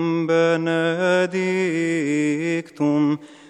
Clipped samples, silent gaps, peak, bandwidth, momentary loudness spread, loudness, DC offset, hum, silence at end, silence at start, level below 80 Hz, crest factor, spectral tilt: under 0.1%; none; -6 dBFS; 10.5 kHz; 4 LU; -21 LUFS; under 0.1%; none; 0.15 s; 0 s; -72 dBFS; 14 dB; -6 dB/octave